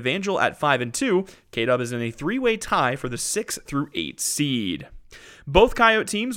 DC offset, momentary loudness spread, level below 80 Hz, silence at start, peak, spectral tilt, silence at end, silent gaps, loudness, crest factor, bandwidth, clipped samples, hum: under 0.1%; 10 LU; -42 dBFS; 0 s; -2 dBFS; -3.5 dB/octave; 0 s; none; -22 LUFS; 22 dB; 17 kHz; under 0.1%; none